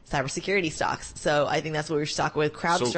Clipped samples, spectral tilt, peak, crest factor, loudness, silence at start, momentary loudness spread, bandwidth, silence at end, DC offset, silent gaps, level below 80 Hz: under 0.1%; -4 dB/octave; -12 dBFS; 14 dB; -26 LUFS; 0.05 s; 4 LU; 8.8 kHz; 0 s; under 0.1%; none; -50 dBFS